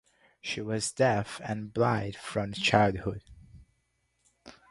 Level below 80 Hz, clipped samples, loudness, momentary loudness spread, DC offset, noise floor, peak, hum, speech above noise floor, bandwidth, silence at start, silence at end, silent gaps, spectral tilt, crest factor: -56 dBFS; under 0.1%; -29 LUFS; 12 LU; under 0.1%; -75 dBFS; -6 dBFS; none; 46 dB; 11.5 kHz; 0.45 s; 0.2 s; none; -5 dB/octave; 24 dB